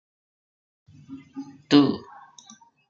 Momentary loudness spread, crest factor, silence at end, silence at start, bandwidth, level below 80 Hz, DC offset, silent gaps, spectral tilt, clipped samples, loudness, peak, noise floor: 25 LU; 24 dB; 0.9 s; 1.1 s; 7.4 kHz; -70 dBFS; under 0.1%; none; -6 dB/octave; under 0.1%; -21 LUFS; -4 dBFS; -53 dBFS